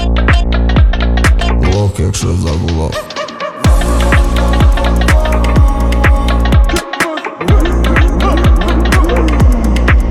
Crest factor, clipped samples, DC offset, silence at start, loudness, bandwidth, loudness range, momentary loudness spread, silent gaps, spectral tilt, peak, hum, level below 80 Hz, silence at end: 10 dB; under 0.1%; under 0.1%; 0 s; -12 LUFS; 14 kHz; 2 LU; 5 LU; none; -6 dB/octave; 0 dBFS; none; -12 dBFS; 0 s